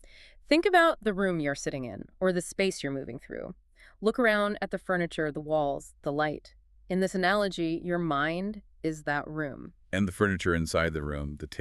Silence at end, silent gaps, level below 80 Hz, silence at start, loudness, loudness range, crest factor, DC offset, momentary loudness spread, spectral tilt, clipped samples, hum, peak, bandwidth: 0 s; none; -50 dBFS; 0.05 s; -29 LUFS; 3 LU; 20 dB; under 0.1%; 13 LU; -5.5 dB/octave; under 0.1%; none; -10 dBFS; 13.5 kHz